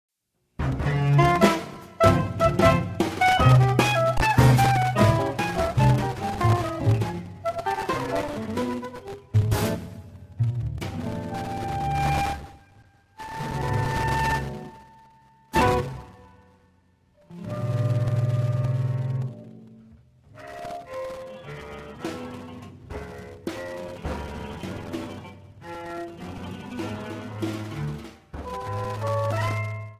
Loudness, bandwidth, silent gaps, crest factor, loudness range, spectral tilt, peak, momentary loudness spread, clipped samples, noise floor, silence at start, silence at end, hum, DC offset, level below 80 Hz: -25 LUFS; 15.5 kHz; none; 22 dB; 16 LU; -6.5 dB/octave; -4 dBFS; 20 LU; under 0.1%; -73 dBFS; 0.6 s; 0.05 s; none; under 0.1%; -40 dBFS